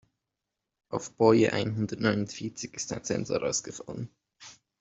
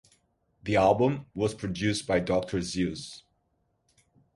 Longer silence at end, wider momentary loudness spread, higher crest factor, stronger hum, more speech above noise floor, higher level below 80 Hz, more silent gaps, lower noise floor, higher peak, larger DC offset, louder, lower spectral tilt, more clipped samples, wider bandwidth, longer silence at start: second, 0.3 s vs 1.15 s; about the same, 19 LU vs 17 LU; about the same, 22 dB vs 20 dB; neither; first, 58 dB vs 47 dB; second, -62 dBFS vs -52 dBFS; neither; first, -86 dBFS vs -74 dBFS; about the same, -8 dBFS vs -10 dBFS; neither; about the same, -28 LUFS vs -28 LUFS; about the same, -5 dB/octave vs -5.5 dB/octave; neither; second, 8.2 kHz vs 11.5 kHz; first, 0.9 s vs 0.65 s